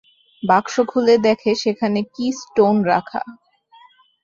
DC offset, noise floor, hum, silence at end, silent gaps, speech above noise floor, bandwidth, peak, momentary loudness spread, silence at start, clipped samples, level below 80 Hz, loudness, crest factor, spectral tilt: under 0.1%; -51 dBFS; none; 0.9 s; none; 33 dB; 7.6 kHz; -2 dBFS; 12 LU; 0.45 s; under 0.1%; -62 dBFS; -18 LUFS; 18 dB; -5.5 dB/octave